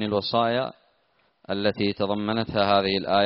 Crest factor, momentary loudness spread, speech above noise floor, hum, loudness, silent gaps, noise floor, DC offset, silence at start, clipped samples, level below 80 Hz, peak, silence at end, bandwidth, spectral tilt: 18 dB; 6 LU; 43 dB; none; -24 LUFS; none; -67 dBFS; under 0.1%; 0 s; under 0.1%; -58 dBFS; -6 dBFS; 0 s; 5.8 kHz; -3.5 dB/octave